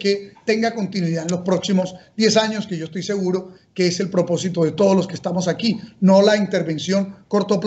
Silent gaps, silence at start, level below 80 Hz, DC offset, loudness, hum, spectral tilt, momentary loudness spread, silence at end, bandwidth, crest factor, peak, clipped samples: none; 0 s; -62 dBFS; under 0.1%; -20 LUFS; none; -5.5 dB/octave; 8 LU; 0 s; 8.2 kHz; 16 dB; -2 dBFS; under 0.1%